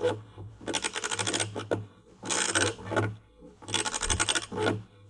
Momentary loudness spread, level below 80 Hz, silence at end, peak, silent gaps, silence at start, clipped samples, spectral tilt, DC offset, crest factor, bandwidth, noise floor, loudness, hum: 16 LU; -50 dBFS; 0 s; -10 dBFS; none; 0 s; under 0.1%; -2.5 dB/octave; under 0.1%; 22 dB; 11.5 kHz; -52 dBFS; -29 LUFS; none